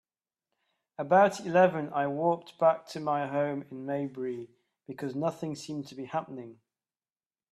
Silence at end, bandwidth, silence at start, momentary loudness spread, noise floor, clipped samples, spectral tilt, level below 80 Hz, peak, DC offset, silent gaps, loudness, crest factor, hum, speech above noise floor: 1 s; 13 kHz; 1 s; 18 LU; under -90 dBFS; under 0.1%; -6.5 dB/octave; -76 dBFS; -8 dBFS; under 0.1%; none; -29 LUFS; 22 dB; none; over 61 dB